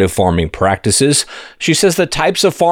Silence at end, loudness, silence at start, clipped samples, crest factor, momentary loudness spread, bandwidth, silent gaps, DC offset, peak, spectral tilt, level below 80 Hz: 0 s; -13 LUFS; 0 s; under 0.1%; 12 dB; 4 LU; 18 kHz; none; under 0.1%; -2 dBFS; -4 dB/octave; -34 dBFS